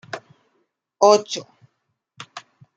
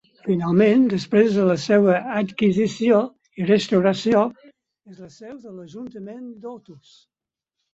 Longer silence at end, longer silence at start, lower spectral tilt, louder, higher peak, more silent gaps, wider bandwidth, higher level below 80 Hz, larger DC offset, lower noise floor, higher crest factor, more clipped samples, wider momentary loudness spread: second, 0.4 s vs 1 s; about the same, 0.15 s vs 0.25 s; second, -3 dB/octave vs -7 dB/octave; about the same, -18 LUFS vs -19 LUFS; about the same, -2 dBFS vs -4 dBFS; neither; first, 9 kHz vs 8 kHz; second, -72 dBFS vs -62 dBFS; neither; second, -74 dBFS vs -83 dBFS; first, 22 dB vs 16 dB; neither; first, 25 LU vs 21 LU